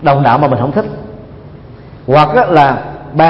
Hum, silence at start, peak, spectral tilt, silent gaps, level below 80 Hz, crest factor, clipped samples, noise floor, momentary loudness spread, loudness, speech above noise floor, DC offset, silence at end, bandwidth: none; 0 s; 0 dBFS; -8.5 dB/octave; none; -40 dBFS; 12 dB; 0.2%; -33 dBFS; 20 LU; -11 LUFS; 23 dB; under 0.1%; 0 s; 6.4 kHz